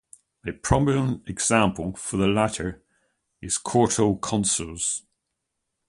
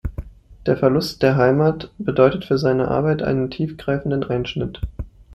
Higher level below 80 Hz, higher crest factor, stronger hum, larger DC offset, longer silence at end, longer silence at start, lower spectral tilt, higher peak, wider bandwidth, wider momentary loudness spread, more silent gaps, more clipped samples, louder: second, -44 dBFS vs -38 dBFS; about the same, 22 dB vs 18 dB; neither; neither; first, 0.9 s vs 0.25 s; first, 0.45 s vs 0.05 s; second, -4.5 dB/octave vs -7.5 dB/octave; about the same, -4 dBFS vs -2 dBFS; second, 11.5 kHz vs 14 kHz; about the same, 11 LU vs 12 LU; neither; neither; second, -24 LUFS vs -20 LUFS